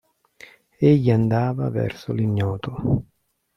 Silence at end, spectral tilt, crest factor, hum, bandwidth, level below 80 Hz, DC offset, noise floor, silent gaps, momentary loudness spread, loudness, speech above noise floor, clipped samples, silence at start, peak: 0.55 s; -9.5 dB/octave; 18 dB; none; 6.4 kHz; -48 dBFS; under 0.1%; -49 dBFS; none; 9 LU; -22 LUFS; 29 dB; under 0.1%; 0.8 s; -4 dBFS